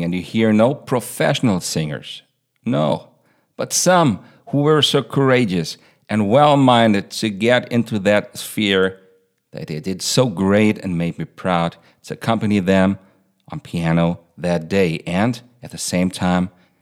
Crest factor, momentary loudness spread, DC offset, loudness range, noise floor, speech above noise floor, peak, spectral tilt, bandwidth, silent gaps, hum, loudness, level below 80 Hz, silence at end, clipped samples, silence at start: 18 dB; 15 LU; under 0.1%; 5 LU; -57 dBFS; 39 dB; 0 dBFS; -5 dB/octave; 16.5 kHz; none; none; -18 LUFS; -54 dBFS; 0.35 s; under 0.1%; 0 s